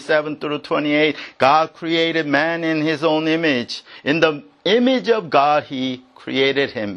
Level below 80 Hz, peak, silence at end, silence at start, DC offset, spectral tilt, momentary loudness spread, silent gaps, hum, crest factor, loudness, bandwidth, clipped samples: -64 dBFS; 0 dBFS; 0 s; 0 s; under 0.1%; -5.5 dB/octave; 9 LU; none; none; 18 dB; -18 LUFS; 10 kHz; under 0.1%